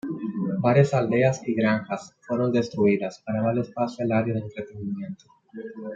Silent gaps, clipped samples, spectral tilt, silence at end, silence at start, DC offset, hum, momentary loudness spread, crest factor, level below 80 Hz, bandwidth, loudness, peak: none; under 0.1%; -7.5 dB/octave; 0 s; 0.05 s; under 0.1%; none; 16 LU; 20 dB; -66 dBFS; 7.8 kHz; -25 LUFS; -4 dBFS